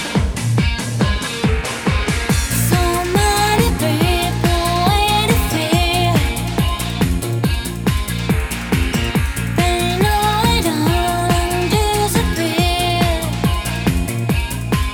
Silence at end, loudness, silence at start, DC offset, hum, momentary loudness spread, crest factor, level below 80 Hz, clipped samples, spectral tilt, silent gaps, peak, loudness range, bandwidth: 0 s; -17 LUFS; 0 s; under 0.1%; none; 5 LU; 16 dB; -24 dBFS; under 0.1%; -4.5 dB/octave; none; 0 dBFS; 3 LU; over 20 kHz